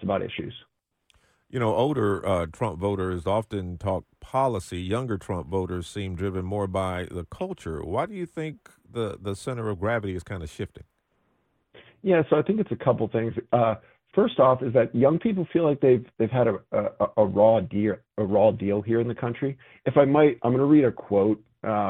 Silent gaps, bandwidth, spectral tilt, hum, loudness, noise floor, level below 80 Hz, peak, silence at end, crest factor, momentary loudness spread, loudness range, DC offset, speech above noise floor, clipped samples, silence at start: none; 11.5 kHz; -8 dB/octave; none; -25 LUFS; -70 dBFS; -52 dBFS; -4 dBFS; 0 s; 20 dB; 13 LU; 9 LU; under 0.1%; 46 dB; under 0.1%; 0 s